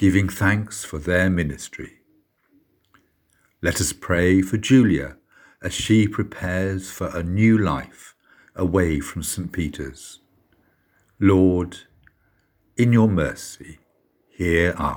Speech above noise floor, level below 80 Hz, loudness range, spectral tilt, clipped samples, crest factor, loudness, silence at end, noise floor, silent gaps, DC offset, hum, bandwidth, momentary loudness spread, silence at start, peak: 44 dB; -44 dBFS; 6 LU; -6 dB/octave; under 0.1%; 20 dB; -21 LUFS; 0 s; -65 dBFS; none; under 0.1%; none; over 20 kHz; 18 LU; 0 s; -2 dBFS